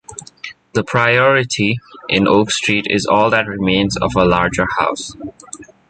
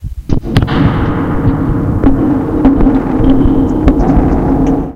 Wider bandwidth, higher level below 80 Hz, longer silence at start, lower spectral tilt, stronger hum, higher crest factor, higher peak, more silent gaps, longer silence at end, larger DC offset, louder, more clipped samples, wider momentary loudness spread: first, 9.4 kHz vs 6.8 kHz; second, -42 dBFS vs -16 dBFS; about the same, 0.1 s vs 0 s; second, -4.5 dB/octave vs -9 dB/octave; neither; first, 16 dB vs 10 dB; about the same, 0 dBFS vs 0 dBFS; neither; first, 0.25 s vs 0 s; neither; second, -15 LUFS vs -11 LUFS; second, under 0.1% vs 0.2%; first, 19 LU vs 4 LU